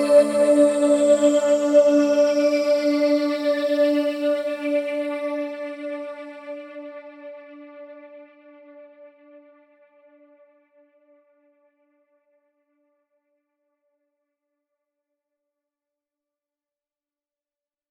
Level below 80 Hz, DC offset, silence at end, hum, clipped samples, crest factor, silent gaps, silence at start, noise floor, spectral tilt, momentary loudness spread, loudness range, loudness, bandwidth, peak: -78 dBFS; under 0.1%; 8.85 s; none; under 0.1%; 20 dB; none; 0 s; under -90 dBFS; -3.5 dB/octave; 23 LU; 23 LU; -20 LUFS; 12.5 kHz; -4 dBFS